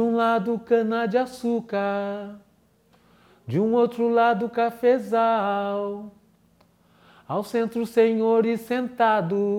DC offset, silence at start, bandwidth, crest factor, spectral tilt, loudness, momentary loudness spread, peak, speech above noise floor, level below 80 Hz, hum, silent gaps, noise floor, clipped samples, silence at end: under 0.1%; 0 s; 15 kHz; 16 dB; -7 dB/octave; -23 LUFS; 9 LU; -8 dBFS; 39 dB; -68 dBFS; none; none; -61 dBFS; under 0.1%; 0 s